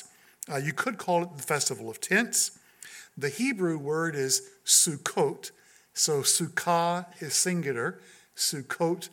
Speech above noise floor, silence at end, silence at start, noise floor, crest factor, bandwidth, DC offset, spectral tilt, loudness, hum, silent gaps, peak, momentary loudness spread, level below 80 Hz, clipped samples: 21 dB; 0.05 s; 0 s; -49 dBFS; 22 dB; 17.5 kHz; under 0.1%; -2.5 dB/octave; -27 LUFS; none; none; -8 dBFS; 13 LU; -80 dBFS; under 0.1%